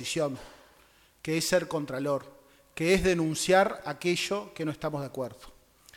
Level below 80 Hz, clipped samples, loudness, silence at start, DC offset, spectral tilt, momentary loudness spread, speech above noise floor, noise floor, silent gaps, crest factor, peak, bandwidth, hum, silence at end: -54 dBFS; under 0.1%; -29 LUFS; 0 s; under 0.1%; -4.5 dB/octave; 13 LU; 32 dB; -61 dBFS; none; 20 dB; -10 dBFS; 17.5 kHz; none; 0 s